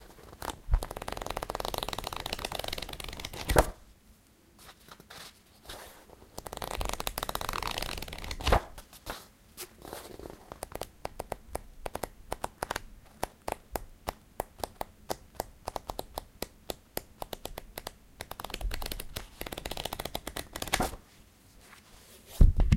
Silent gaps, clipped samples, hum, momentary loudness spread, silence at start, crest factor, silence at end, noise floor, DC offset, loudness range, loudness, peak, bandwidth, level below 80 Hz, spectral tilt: none; under 0.1%; none; 18 LU; 0 s; 34 dB; 0 s; -60 dBFS; under 0.1%; 8 LU; -36 LUFS; -2 dBFS; 17 kHz; -38 dBFS; -4 dB/octave